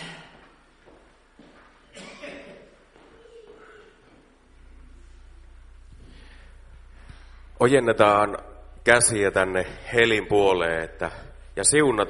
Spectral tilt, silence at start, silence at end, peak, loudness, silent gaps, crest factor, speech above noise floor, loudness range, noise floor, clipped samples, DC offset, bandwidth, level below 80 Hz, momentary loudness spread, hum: -3 dB/octave; 0 s; 0 s; 0 dBFS; -21 LUFS; none; 26 dB; 34 dB; 7 LU; -55 dBFS; under 0.1%; under 0.1%; 11.5 kHz; -48 dBFS; 22 LU; none